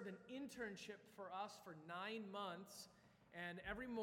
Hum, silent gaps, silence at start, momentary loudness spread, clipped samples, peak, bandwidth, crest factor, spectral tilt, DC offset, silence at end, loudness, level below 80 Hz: none; none; 0 s; 9 LU; under 0.1%; -34 dBFS; 16.5 kHz; 18 dB; -4 dB/octave; under 0.1%; 0 s; -52 LUFS; -74 dBFS